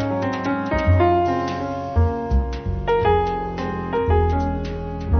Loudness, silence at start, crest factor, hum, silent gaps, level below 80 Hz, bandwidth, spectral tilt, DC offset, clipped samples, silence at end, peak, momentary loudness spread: -21 LUFS; 0 s; 14 dB; none; none; -26 dBFS; 6.6 kHz; -8.5 dB/octave; under 0.1%; under 0.1%; 0 s; -6 dBFS; 9 LU